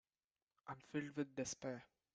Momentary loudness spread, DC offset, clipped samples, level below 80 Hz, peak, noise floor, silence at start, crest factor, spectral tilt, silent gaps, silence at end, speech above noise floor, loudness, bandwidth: 10 LU; under 0.1%; under 0.1%; -80 dBFS; -30 dBFS; under -90 dBFS; 0.65 s; 20 dB; -4.5 dB/octave; none; 0.3 s; over 43 dB; -48 LUFS; 9 kHz